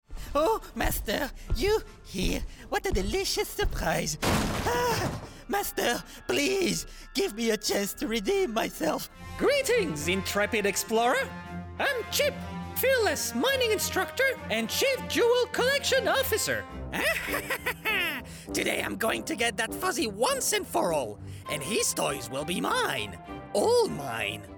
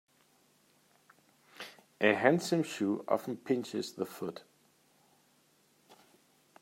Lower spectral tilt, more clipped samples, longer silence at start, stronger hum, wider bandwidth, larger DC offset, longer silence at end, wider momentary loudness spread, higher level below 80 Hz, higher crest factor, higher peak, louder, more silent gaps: second, -3 dB/octave vs -5 dB/octave; neither; second, 0.1 s vs 1.6 s; neither; first, over 20 kHz vs 16 kHz; neither; second, 0 s vs 0.7 s; second, 8 LU vs 21 LU; first, -42 dBFS vs -84 dBFS; second, 14 dB vs 26 dB; second, -14 dBFS vs -10 dBFS; first, -28 LUFS vs -32 LUFS; neither